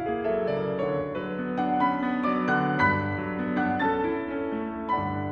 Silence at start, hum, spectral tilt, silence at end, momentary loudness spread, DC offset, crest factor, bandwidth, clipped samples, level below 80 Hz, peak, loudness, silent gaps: 0 s; none; -8.5 dB/octave; 0 s; 7 LU; under 0.1%; 16 dB; 6.6 kHz; under 0.1%; -54 dBFS; -10 dBFS; -27 LUFS; none